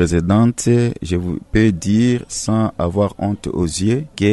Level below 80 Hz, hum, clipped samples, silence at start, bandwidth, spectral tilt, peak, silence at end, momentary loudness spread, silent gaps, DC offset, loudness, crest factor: -36 dBFS; none; under 0.1%; 0 s; 12 kHz; -6 dB/octave; -2 dBFS; 0 s; 7 LU; none; under 0.1%; -17 LUFS; 14 dB